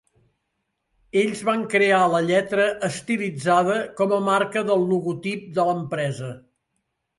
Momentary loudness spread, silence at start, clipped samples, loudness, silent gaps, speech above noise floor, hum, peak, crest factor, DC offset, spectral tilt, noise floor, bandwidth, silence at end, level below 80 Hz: 9 LU; 1.15 s; under 0.1%; -22 LUFS; none; 55 dB; none; -6 dBFS; 18 dB; under 0.1%; -5.5 dB/octave; -76 dBFS; 11.5 kHz; 0.8 s; -66 dBFS